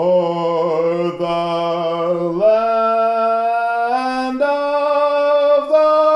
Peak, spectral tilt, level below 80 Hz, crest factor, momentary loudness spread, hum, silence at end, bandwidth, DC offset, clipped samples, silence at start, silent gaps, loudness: -4 dBFS; -6.5 dB/octave; -56 dBFS; 12 dB; 6 LU; none; 0 s; 10.5 kHz; under 0.1%; under 0.1%; 0 s; none; -16 LUFS